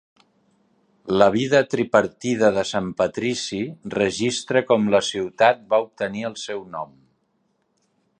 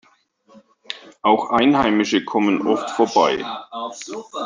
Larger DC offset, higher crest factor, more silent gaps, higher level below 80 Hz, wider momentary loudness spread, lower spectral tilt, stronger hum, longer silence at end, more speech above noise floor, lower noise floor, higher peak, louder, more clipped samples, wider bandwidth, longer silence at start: neither; about the same, 20 dB vs 18 dB; neither; about the same, -58 dBFS vs -56 dBFS; second, 12 LU vs 16 LU; about the same, -4.5 dB/octave vs -4.5 dB/octave; neither; first, 1.35 s vs 0 s; first, 48 dB vs 38 dB; first, -69 dBFS vs -56 dBFS; about the same, -2 dBFS vs -2 dBFS; about the same, -21 LUFS vs -19 LUFS; neither; about the same, 9.6 kHz vs 9.6 kHz; first, 1.05 s vs 0.9 s